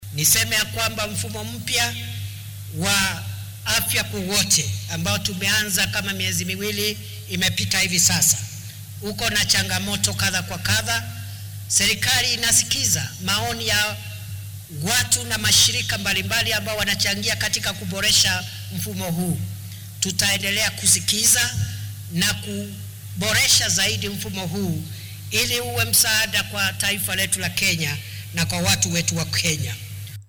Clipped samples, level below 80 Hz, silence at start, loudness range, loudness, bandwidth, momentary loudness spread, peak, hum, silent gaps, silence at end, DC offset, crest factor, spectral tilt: under 0.1%; -46 dBFS; 0 s; 2 LU; -20 LUFS; over 20 kHz; 17 LU; -6 dBFS; none; none; 0.05 s; under 0.1%; 18 dB; -2 dB/octave